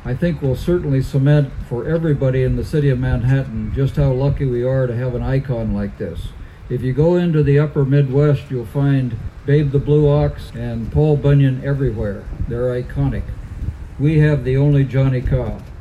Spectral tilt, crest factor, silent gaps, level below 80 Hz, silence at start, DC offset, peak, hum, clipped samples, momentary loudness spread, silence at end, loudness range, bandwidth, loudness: -9.5 dB/octave; 14 dB; none; -30 dBFS; 0 s; under 0.1%; -4 dBFS; none; under 0.1%; 12 LU; 0 s; 3 LU; 5.2 kHz; -18 LUFS